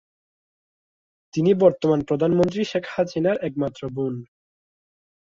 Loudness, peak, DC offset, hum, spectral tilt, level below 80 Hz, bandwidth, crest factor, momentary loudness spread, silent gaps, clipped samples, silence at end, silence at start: -22 LUFS; -4 dBFS; under 0.1%; none; -7.5 dB/octave; -58 dBFS; 7.6 kHz; 20 dB; 11 LU; none; under 0.1%; 1.15 s; 1.35 s